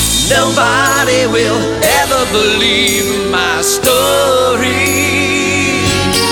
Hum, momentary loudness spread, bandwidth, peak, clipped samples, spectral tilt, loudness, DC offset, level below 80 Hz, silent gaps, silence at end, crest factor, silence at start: none; 3 LU; over 20 kHz; 0 dBFS; under 0.1%; -2.5 dB/octave; -11 LUFS; under 0.1%; -32 dBFS; none; 0 s; 12 dB; 0 s